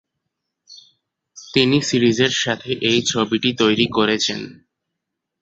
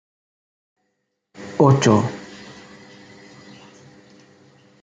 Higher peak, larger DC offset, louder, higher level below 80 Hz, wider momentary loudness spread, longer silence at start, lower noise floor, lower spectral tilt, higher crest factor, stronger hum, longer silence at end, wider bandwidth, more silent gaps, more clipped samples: about the same, -2 dBFS vs -2 dBFS; neither; about the same, -18 LUFS vs -17 LUFS; first, -56 dBFS vs -64 dBFS; second, 6 LU vs 26 LU; second, 0.7 s vs 1.4 s; first, -80 dBFS vs -74 dBFS; second, -4 dB/octave vs -6.5 dB/octave; about the same, 20 dB vs 22 dB; neither; second, 0.9 s vs 2.55 s; about the same, 8.2 kHz vs 9 kHz; neither; neither